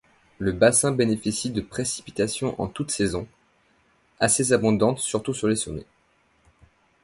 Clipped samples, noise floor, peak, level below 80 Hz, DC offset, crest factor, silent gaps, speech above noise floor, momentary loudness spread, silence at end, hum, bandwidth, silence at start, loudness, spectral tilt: under 0.1%; -64 dBFS; -4 dBFS; -50 dBFS; under 0.1%; 20 dB; none; 41 dB; 11 LU; 1.2 s; none; 11.5 kHz; 0.4 s; -23 LUFS; -4 dB/octave